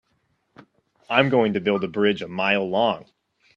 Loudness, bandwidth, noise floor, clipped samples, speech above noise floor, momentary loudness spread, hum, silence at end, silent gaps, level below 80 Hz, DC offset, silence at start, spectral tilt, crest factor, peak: -22 LUFS; 7.4 kHz; -69 dBFS; under 0.1%; 48 dB; 5 LU; none; 0.55 s; none; -64 dBFS; under 0.1%; 1.1 s; -7 dB/octave; 22 dB; -2 dBFS